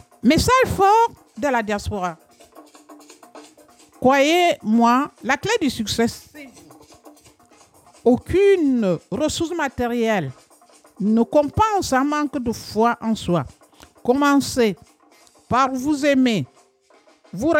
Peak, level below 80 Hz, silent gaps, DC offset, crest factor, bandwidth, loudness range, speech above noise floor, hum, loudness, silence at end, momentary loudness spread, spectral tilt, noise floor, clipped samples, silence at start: -6 dBFS; -44 dBFS; none; under 0.1%; 16 dB; 17 kHz; 3 LU; 37 dB; none; -19 LUFS; 0 s; 10 LU; -5 dB/octave; -55 dBFS; under 0.1%; 0.25 s